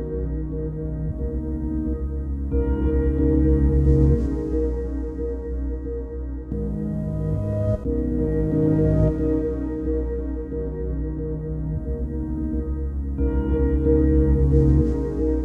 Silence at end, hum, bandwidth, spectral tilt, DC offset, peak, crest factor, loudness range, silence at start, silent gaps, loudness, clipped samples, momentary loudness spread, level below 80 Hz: 0 s; none; 2.5 kHz; -11.5 dB/octave; under 0.1%; -6 dBFS; 16 dB; 6 LU; 0 s; none; -24 LUFS; under 0.1%; 10 LU; -26 dBFS